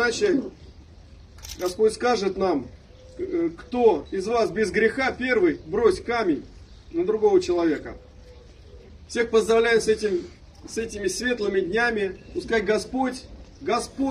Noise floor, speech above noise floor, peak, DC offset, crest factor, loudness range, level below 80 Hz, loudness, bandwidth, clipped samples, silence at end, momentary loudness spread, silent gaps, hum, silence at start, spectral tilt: -47 dBFS; 24 dB; -6 dBFS; under 0.1%; 18 dB; 3 LU; -48 dBFS; -24 LUFS; 14.5 kHz; under 0.1%; 0 s; 12 LU; none; none; 0 s; -4.5 dB/octave